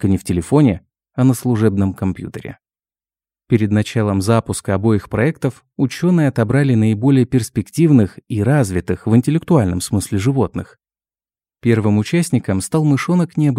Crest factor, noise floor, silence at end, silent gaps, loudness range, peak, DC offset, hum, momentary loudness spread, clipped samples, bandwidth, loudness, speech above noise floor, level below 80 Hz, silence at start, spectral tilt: 16 dB; under -90 dBFS; 0 s; none; 4 LU; 0 dBFS; under 0.1%; none; 8 LU; under 0.1%; 15.5 kHz; -16 LUFS; over 75 dB; -46 dBFS; 0 s; -7 dB/octave